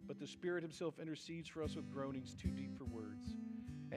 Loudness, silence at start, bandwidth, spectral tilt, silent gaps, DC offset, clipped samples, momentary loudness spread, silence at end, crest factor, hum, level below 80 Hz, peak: -47 LUFS; 0 s; 14 kHz; -6 dB/octave; none; under 0.1%; under 0.1%; 6 LU; 0 s; 18 dB; none; -62 dBFS; -28 dBFS